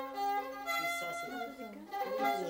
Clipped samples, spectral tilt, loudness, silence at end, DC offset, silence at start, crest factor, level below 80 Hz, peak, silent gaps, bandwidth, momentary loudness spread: under 0.1%; -2.5 dB/octave; -37 LUFS; 0 s; under 0.1%; 0 s; 16 dB; -74 dBFS; -20 dBFS; none; 16 kHz; 9 LU